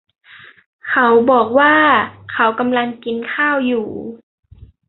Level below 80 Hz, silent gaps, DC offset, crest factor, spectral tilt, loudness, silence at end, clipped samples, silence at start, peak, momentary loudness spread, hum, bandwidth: -54 dBFS; none; under 0.1%; 16 dB; -9 dB/octave; -14 LUFS; 0.7 s; under 0.1%; 0.85 s; 0 dBFS; 14 LU; none; 4.2 kHz